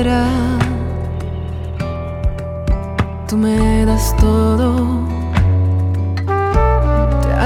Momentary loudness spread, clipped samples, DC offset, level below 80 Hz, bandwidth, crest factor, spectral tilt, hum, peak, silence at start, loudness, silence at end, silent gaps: 9 LU; under 0.1%; under 0.1%; -20 dBFS; 16 kHz; 14 dB; -7 dB/octave; none; 0 dBFS; 0 s; -17 LUFS; 0 s; none